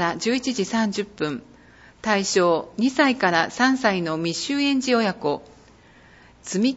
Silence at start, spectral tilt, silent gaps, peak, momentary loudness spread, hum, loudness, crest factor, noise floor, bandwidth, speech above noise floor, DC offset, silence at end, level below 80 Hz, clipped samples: 0 s; -4 dB/octave; none; -4 dBFS; 10 LU; none; -22 LUFS; 18 dB; -51 dBFS; 8 kHz; 29 dB; under 0.1%; 0 s; -60 dBFS; under 0.1%